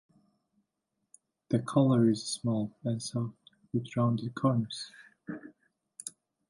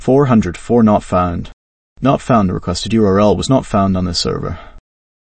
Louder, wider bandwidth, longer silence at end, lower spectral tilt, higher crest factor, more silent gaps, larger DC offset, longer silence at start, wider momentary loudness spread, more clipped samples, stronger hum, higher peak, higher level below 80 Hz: second, -31 LUFS vs -14 LUFS; first, 11.5 kHz vs 8.8 kHz; about the same, 0.4 s vs 0.4 s; about the same, -6.5 dB/octave vs -6.5 dB/octave; first, 20 dB vs 14 dB; second, none vs 1.53-1.96 s; neither; first, 1.5 s vs 0 s; first, 19 LU vs 8 LU; neither; neither; second, -12 dBFS vs 0 dBFS; second, -70 dBFS vs -34 dBFS